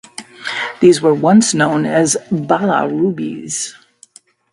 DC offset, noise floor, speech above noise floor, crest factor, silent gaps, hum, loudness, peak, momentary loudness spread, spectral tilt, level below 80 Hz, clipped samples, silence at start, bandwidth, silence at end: under 0.1%; -46 dBFS; 33 dB; 16 dB; none; none; -14 LUFS; 0 dBFS; 13 LU; -4.5 dB/octave; -58 dBFS; under 0.1%; 0.2 s; 11.5 kHz; 0.8 s